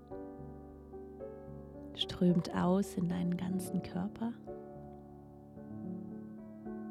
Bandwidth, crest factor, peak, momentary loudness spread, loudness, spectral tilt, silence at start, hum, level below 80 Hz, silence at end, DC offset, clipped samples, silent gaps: 13.5 kHz; 18 dB; -20 dBFS; 19 LU; -37 LUFS; -6.5 dB/octave; 0 s; none; -62 dBFS; 0 s; under 0.1%; under 0.1%; none